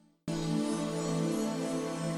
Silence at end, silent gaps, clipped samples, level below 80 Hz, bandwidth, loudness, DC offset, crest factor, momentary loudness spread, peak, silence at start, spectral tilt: 0 s; none; under 0.1%; -58 dBFS; 15 kHz; -33 LUFS; under 0.1%; 14 dB; 3 LU; -20 dBFS; 0.25 s; -5.5 dB/octave